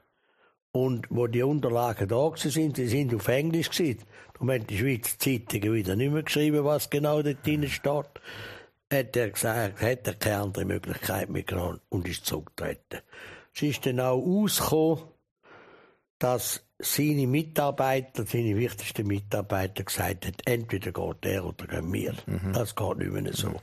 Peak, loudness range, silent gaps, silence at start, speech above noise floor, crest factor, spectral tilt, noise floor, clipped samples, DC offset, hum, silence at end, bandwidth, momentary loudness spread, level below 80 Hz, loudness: -10 dBFS; 4 LU; 15.31-15.36 s, 16.10-16.20 s; 0.75 s; 39 dB; 18 dB; -5 dB/octave; -67 dBFS; under 0.1%; under 0.1%; none; 0 s; 15.5 kHz; 8 LU; -54 dBFS; -28 LUFS